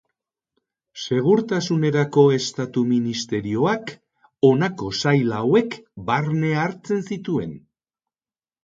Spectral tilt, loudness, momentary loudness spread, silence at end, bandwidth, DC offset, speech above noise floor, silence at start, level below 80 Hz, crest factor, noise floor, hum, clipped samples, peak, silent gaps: -6 dB/octave; -21 LUFS; 9 LU; 1.05 s; 7.8 kHz; under 0.1%; over 70 dB; 0.95 s; -58 dBFS; 18 dB; under -90 dBFS; none; under 0.1%; -2 dBFS; none